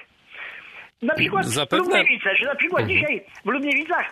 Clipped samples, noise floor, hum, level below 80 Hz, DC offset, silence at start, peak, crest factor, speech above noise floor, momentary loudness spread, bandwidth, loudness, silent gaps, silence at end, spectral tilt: under 0.1%; -42 dBFS; none; -62 dBFS; under 0.1%; 0.3 s; -6 dBFS; 16 dB; 21 dB; 18 LU; 13.5 kHz; -20 LUFS; none; 0 s; -4 dB/octave